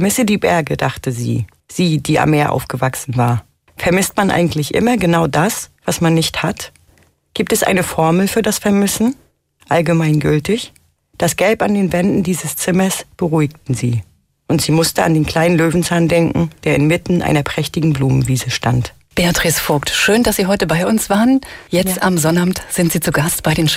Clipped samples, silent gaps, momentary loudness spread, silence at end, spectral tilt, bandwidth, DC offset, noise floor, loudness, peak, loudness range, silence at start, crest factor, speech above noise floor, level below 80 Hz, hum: under 0.1%; none; 7 LU; 0 s; -5 dB/octave; 16 kHz; under 0.1%; -53 dBFS; -15 LUFS; -2 dBFS; 2 LU; 0 s; 12 dB; 38 dB; -40 dBFS; none